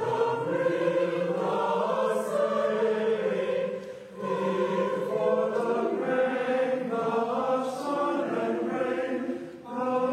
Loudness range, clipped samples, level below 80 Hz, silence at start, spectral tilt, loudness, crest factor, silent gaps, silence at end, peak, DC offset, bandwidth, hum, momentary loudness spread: 2 LU; under 0.1%; -76 dBFS; 0 s; -6 dB/octave; -28 LUFS; 14 dB; none; 0 s; -14 dBFS; under 0.1%; 13 kHz; none; 5 LU